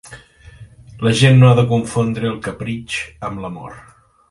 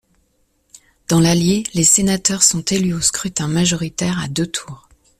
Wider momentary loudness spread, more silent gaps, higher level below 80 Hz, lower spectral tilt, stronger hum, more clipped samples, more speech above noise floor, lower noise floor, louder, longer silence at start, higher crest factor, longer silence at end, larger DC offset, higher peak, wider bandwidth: first, 19 LU vs 10 LU; neither; about the same, -46 dBFS vs -44 dBFS; first, -6.5 dB/octave vs -3.5 dB/octave; neither; neither; second, 26 dB vs 46 dB; second, -41 dBFS vs -63 dBFS; about the same, -16 LUFS vs -16 LUFS; second, 0.05 s vs 1.1 s; about the same, 16 dB vs 18 dB; about the same, 0.5 s vs 0.45 s; neither; about the same, 0 dBFS vs 0 dBFS; second, 11.5 kHz vs 15.5 kHz